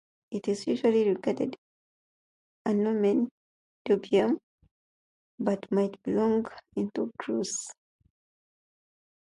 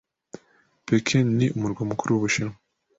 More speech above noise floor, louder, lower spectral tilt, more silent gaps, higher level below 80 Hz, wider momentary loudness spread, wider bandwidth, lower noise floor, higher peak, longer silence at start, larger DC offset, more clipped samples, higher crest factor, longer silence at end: first, over 63 dB vs 39 dB; second, -29 LUFS vs -24 LUFS; about the same, -5.5 dB/octave vs -5.5 dB/octave; first, 1.58-2.65 s, 3.31-3.85 s, 4.43-4.58 s, 4.71-5.38 s vs none; second, -70 dBFS vs -56 dBFS; about the same, 10 LU vs 8 LU; first, 11.5 kHz vs 8 kHz; first, under -90 dBFS vs -62 dBFS; second, -12 dBFS vs -8 dBFS; second, 0.3 s vs 0.9 s; neither; neither; about the same, 18 dB vs 18 dB; first, 1.55 s vs 0.45 s